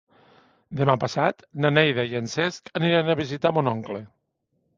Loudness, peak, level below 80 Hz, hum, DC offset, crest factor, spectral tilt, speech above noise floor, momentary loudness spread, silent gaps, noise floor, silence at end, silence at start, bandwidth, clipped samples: -23 LUFS; -2 dBFS; -60 dBFS; none; under 0.1%; 22 dB; -6 dB/octave; 50 dB; 9 LU; none; -74 dBFS; 0.7 s; 0.7 s; 7.6 kHz; under 0.1%